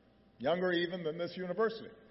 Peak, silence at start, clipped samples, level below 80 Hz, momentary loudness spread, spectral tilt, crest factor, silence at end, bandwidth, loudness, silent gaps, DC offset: -20 dBFS; 0.4 s; under 0.1%; -72 dBFS; 7 LU; -3.5 dB/octave; 16 dB; 0.05 s; 5.8 kHz; -35 LUFS; none; under 0.1%